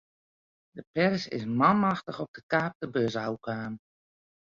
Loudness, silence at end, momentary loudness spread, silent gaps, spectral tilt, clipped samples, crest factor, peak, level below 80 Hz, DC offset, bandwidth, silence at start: -29 LUFS; 0.7 s; 16 LU; 0.87-0.94 s, 2.28-2.34 s, 2.43-2.49 s, 2.75-2.80 s; -7 dB/octave; under 0.1%; 22 dB; -8 dBFS; -66 dBFS; under 0.1%; 7.4 kHz; 0.75 s